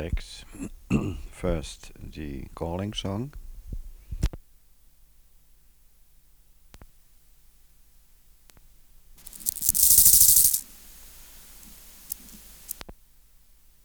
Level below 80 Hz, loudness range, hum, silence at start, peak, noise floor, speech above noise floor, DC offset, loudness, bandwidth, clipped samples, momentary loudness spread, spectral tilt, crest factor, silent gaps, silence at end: -42 dBFS; 22 LU; none; 0 s; -4 dBFS; -57 dBFS; 26 dB; under 0.1%; -20 LUFS; over 20 kHz; under 0.1%; 30 LU; -2.5 dB/octave; 24 dB; none; 0.9 s